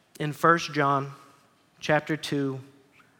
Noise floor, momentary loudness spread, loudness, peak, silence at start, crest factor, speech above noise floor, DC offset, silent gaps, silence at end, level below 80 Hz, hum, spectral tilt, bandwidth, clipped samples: -60 dBFS; 14 LU; -26 LUFS; -6 dBFS; 0.2 s; 22 dB; 35 dB; under 0.1%; none; 0.55 s; -72 dBFS; none; -5.5 dB/octave; 17.5 kHz; under 0.1%